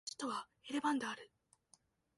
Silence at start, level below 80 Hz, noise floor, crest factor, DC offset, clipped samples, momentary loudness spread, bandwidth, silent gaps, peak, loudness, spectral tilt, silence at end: 0.05 s; -84 dBFS; -73 dBFS; 20 dB; under 0.1%; under 0.1%; 13 LU; 11.5 kHz; none; -24 dBFS; -41 LUFS; -2.5 dB/octave; 0.9 s